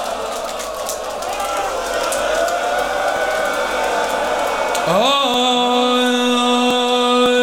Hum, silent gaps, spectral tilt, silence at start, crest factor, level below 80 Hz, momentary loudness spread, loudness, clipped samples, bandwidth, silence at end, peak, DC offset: none; none; -2.5 dB/octave; 0 s; 14 dB; -46 dBFS; 9 LU; -17 LUFS; under 0.1%; over 20 kHz; 0 s; -4 dBFS; under 0.1%